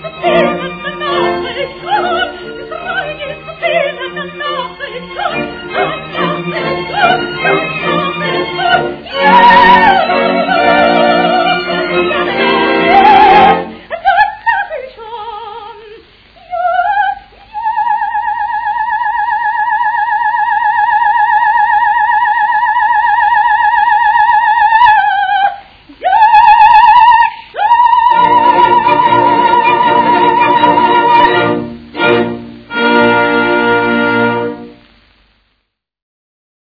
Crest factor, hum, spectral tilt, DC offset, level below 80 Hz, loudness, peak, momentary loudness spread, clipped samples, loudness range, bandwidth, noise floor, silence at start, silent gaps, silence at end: 10 dB; none; -6.5 dB/octave; under 0.1%; -44 dBFS; -10 LUFS; 0 dBFS; 14 LU; 0.6%; 9 LU; 5.4 kHz; -67 dBFS; 0 s; none; 1.95 s